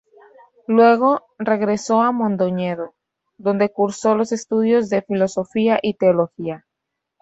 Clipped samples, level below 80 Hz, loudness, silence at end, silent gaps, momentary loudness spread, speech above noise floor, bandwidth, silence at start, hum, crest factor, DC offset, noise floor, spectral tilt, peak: under 0.1%; -64 dBFS; -19 LUFS; 0.65 s; none; 11 LU; 62 dB; 8.2 kHz; 0.7 s; none; 16 dB; under 0.1%; -80 dBFS; -6 dB/octave; -2 dBFS